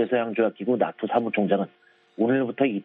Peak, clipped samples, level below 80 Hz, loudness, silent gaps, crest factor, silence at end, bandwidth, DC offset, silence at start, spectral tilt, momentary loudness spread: -8 dBFS; under 0.1%; -70 dBFS; -25 LUFS; none; 18 dB; 0 s; 4 kHz; under 0.1%; 0 s; -10 dB/octave; 3 LU